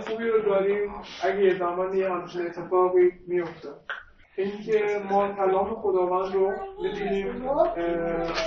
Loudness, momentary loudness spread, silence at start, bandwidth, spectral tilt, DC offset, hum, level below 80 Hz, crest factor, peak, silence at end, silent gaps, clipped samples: -26 LUFS; 10 LU; 0 s; 6.6 kHz; -4.5 dB/octave; under 0.1%; none; -52 dBFS; 16 dB; -8 dBFS; 0 s; none; under 0.1%